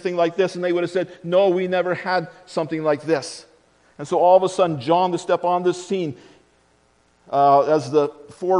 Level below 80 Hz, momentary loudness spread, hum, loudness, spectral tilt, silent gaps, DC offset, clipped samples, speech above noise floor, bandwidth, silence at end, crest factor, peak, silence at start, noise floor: -68 dBFS; 11 LU; none; -20 LUFS; -6 dB/octave; none; under 0.1%; under 0.1%; 40 dB; 10.5 kHz; 0 s; 18 dB; -4 dBFS; 0.05 s; -60 dBFS